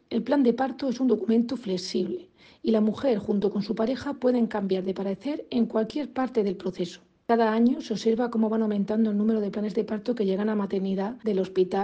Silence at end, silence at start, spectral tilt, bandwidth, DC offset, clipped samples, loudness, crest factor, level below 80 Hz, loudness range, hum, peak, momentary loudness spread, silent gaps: 0 s; 0.1 s; -7 dB/octave; 8.4 kHz; under 0.1%; under 0.1%; -26 LUFS; 16 dB; -64 dBFS; 2 LU; none; -10 dBFS; 7 LU; none